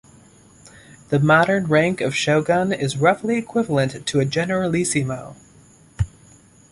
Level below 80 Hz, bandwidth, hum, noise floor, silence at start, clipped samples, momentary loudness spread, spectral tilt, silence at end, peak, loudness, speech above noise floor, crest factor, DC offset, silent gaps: -44 dBFS; 11.5 kHz; none; -50 dBFS; 0.65 s; under 0.1%; 12 LU; -5.5 dB/octave; 0.65 s; -2 dBFS; -20 LUFS; 31 dB; 18 dB; under 0.1%; none